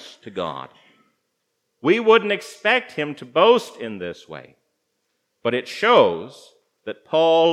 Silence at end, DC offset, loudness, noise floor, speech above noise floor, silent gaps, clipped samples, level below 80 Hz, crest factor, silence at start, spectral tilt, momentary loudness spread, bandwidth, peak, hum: 0 s; under 0.1%; -19 LUFS; -74 dBFS; 55 dB; none; under 0.1%; -74 dBFS; 20 dB; 0 s; -4.5 dB/octave; 20 LU; 12.5 kHz; -2 dBFS; none